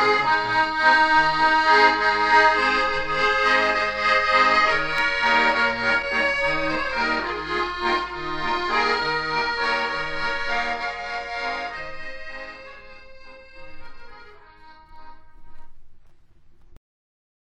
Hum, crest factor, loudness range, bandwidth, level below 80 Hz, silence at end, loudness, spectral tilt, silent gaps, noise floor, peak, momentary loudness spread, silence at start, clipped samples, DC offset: none; 18 dB; 15 LU; 10 kHz; -46 dBFS; 0.85 s; -20 LUFS; -3 dB/octave; none; -48 dBFS; -4 dBFS; 13 LU; 0 s; under 0.1%; under 0.1%